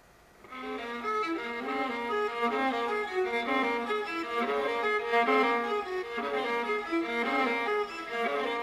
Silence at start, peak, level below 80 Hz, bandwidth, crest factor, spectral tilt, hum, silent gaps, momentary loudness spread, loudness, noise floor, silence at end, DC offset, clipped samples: 0.45 s; -14 dBFS; -66 dBFS; 15 kHz; 16 dB; -3.5 dB/octave; none; none; 7 LU; -30 LUFS; -56 dBFS; 0 s; under 0.1%; under 0.1%